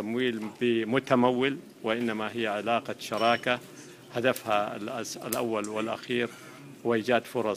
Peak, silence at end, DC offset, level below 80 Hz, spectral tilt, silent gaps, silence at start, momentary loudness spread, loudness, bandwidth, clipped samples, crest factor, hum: -8 dBFS; 0 s; under 0.1%; -70 dBFS; -4.5 dB/octave; none; 0 s; 10 LU; -29 LUFS; 15.5 kHz; under 0.1%; 20 dB; none